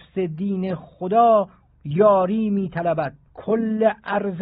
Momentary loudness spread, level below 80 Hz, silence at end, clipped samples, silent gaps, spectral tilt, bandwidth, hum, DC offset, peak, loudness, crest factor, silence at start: 13 LU; -56 dBFS; 0 s; under 0.1%; none; -7 dB/octave; 4.9 kHz; none; under 0.1%; -6 dBFS; -21 LUFS; 16 dB; 0.15 s